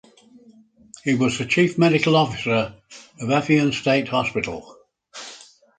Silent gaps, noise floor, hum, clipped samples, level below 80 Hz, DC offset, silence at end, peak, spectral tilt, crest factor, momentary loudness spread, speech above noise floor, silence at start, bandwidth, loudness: none; -52 dBFS; none; under 0.1%; -56 dBFS; under 0.1%; 0.4 s; -4 dBFS; -5.5 dB/octave; 18 dB; 19 LU; 31 dB; 1.05 s; 9.4 kHz; -20 LUFS